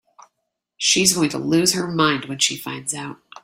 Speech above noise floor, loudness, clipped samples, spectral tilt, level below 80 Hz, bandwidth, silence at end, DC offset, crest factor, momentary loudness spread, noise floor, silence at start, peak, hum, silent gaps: 58 dB; -19 LUFS; under 0.1%; -2.5 dB/octave; -58 dBFS; 16.5 kHz; 0.05 s; under 0.1%; 20 dB; 12 LU; -78 dBFS; 0.8 s; 0 dBFS; none; none